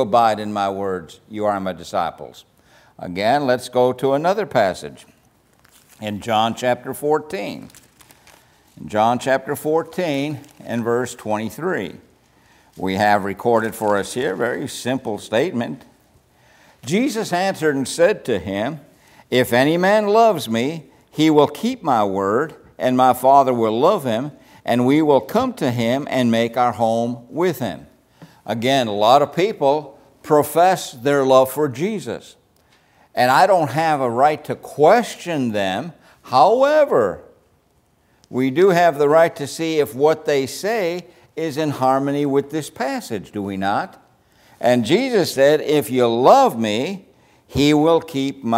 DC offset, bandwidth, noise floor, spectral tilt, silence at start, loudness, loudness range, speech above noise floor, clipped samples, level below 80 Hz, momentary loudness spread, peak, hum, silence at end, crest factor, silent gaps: under 0.1%; 16 kHz; -60 dBFS; -5.5 dB/octave; 0 s; -18 LUFS; 6 LU; 42 dB; under 0.1%; -58 dBFS; 14 LU; 0 dBFS; none; 0 s; 18 dB; none